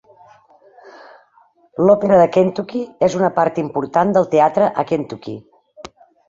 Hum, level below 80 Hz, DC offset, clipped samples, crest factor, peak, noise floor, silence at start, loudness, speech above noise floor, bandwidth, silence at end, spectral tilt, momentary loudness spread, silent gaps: none; -58 dBFS; under 0.1%; under 0.1%; 16 dB; -2 dBFS; -54 dBFS; 0.85 s; -16 LUFS; 39 dB; 7.6 kHz; 0.45 s; -7 dB/octave; 17 LU; none